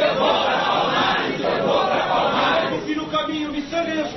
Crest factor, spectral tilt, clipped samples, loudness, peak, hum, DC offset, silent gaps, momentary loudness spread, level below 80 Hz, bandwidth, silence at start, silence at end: 14 dB; -4.5 dB/octave; under 0.1%; -20 LUFS; -6 dBFS; none; under 0.1%; none; 6 LU; -50 dBFS; 6.2 kHz; 0 s; 0 s